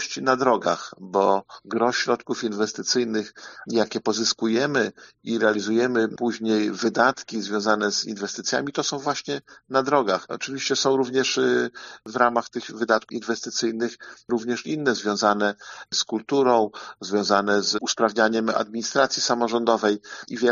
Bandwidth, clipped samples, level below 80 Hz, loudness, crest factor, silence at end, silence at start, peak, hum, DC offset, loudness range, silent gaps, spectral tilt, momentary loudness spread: 7.4 kHz; under 0.1%; -72 dBFS; -23 LUFS; 20 dB; 0 s; 0 s; -4 dBFS; none; under 0.1%; 3 LU; none; -2.5 dB/octave; 9 LU